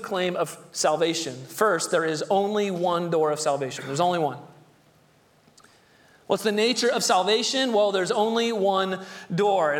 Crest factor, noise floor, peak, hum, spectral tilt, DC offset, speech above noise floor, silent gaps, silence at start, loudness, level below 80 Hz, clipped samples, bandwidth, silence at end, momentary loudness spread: 18 dB; -59 dBFS; -6 dBFS; none; -3.5 dB/octave; under 0.1%; 36 dB; none; 0 s; -24 LUFS; -74 dBFS; under 0.1%; 18.5 kHz; 0 s; 8 LU